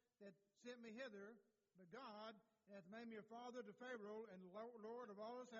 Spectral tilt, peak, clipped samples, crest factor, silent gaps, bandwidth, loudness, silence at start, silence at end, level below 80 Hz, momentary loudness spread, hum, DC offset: -3.5 dB/octave; -42 dBFS; under 0.1%; 16 dB; none; 7.2 kHz; -58 LUFS; 0.2 s; 0 s; under -90 dBFS; 9 LU; none; under 0.1%